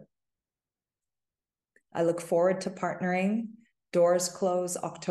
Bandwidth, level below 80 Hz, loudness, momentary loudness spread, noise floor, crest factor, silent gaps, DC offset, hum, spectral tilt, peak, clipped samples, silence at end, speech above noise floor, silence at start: 12.5 kHz; -78 dBFS; -28 LUFS; 9 LU; under -90 dBFS; 16 dB; none; under 0.1%; none; -5 dB/octave; -14 dBFS; under 0.1%; 0 s; over 62 dB; 0 s